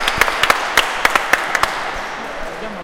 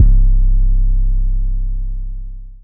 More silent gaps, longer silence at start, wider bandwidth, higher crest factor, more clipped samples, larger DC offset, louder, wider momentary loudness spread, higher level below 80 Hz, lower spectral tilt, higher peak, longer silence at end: neither; about the same, 0 s vs 0 s; first, over 20 kHz vs 0.5 kHz; first, 18 dB vs 12 dB; first, 0.1% vs under 0.1%; neither; first, -16 LUFS vs -19 LUFS; about the same, 13 LU vs 14 LU; second, -38 dBFS vs -12 dBFS; second, -1 dB/octave vs -14.5 dB/octave; about the same, 0 dBFS vs 0 dBFS; about the same, 0 s vs 0.05 s